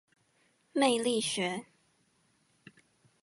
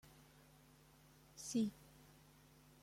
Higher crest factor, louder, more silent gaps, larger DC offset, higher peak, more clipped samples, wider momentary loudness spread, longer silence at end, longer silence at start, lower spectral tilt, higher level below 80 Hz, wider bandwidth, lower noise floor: about the same, 22 dB vs 20 dB; first, -31 LUFS vs -43 LUFS; neither; neither; first, -14 dBFS vs -28 dBFS; neither; second, 10 LU vs 25 LU; first, 1.6 s vs 0.75 s; first, 0.75 s vs 0.05 s; second, -3 dB/octave vs -4.5 dB/octave; second, -82 dBFS vs -76 dBFS; second, 11.5 kHz vs 16.5 kHz; first, -71 dBFS vs -67 dBFS